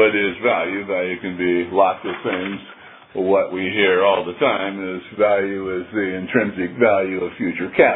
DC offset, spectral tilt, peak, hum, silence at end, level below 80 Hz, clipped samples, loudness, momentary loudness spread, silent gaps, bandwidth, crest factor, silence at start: under 0.1%; -9.5 dB/octave; 0 dBFS; none; 0 s; -60 dBFS; under 0.1%; -20 LUFS; 9 LU; none; 4 kHz; 18 dB; 0 s